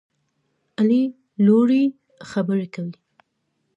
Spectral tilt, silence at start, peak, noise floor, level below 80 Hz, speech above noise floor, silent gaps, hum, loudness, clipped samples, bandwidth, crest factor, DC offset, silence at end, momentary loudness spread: -8.5 dB/octave; 0.8 s; -6 dBFS; -73 dBFS; -72 dBFS; 54 dB; none; none; -20 LUFS; under 0.1%; 8 kHz; 16 dB; under 0.1%; 0.85 s; 16 LU